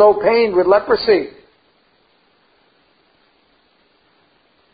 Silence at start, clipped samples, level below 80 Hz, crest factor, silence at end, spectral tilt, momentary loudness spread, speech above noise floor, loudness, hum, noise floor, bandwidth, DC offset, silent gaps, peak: 0 s; under 0.1%; -54 dBFS; 18 dB; 3.45 s; -9.5 dB/octave; 5 LU; 45 dB; -14 LUFS; none; -58 dBFS; 5 kHz; under 0.1%; none; 0 dBFS